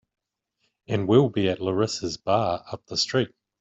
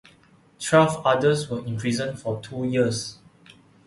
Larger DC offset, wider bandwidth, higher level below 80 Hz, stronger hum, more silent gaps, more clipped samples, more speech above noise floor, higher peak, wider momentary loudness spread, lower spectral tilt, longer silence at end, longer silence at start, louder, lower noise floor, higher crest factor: neither; second, 8 kHz vs 11.5 kHz; about the same, -60 dBFS vs -58 dBFS; neither; neither; neither; first, 51 dB vs 33 dB; about the same, -6 dBFS vs -4 dBFS; about the same, 10 LU vs 12 LU; about the same, -5.5 dB/octave vs -5.5 dB/octave; second, 0.35 s vs 0.75 s; first, 0.9 s vs 0.6 s; about the same, -25 LUFS vs -23 LUFS; first, -75 dBFS vs -56 dBFS; about the same, 20 dB vs 20 dB